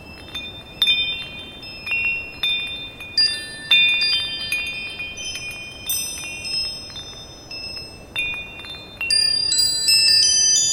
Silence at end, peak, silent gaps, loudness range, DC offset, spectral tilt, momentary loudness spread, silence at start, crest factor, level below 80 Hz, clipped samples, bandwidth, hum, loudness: 0 s; -4 dBFS; none; 9 LU; under 0.1%; 1.5 dB/octave; 19 LU; 0 s; 18 dB; -48 dBFS; under 0.1%; 16 kHz; none; -18 LUFS